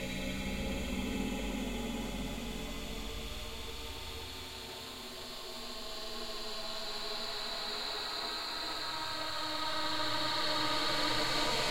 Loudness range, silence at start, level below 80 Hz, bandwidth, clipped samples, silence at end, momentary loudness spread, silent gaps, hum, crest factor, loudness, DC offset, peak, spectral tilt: 9 LU; 0 s; -48 dBFS; 16 kHz; under 0.1%; 0 s; 11 LU; none; none; 16 dB; -36 LUFS; 0.4%; -20 dBFS; -3 dB/octave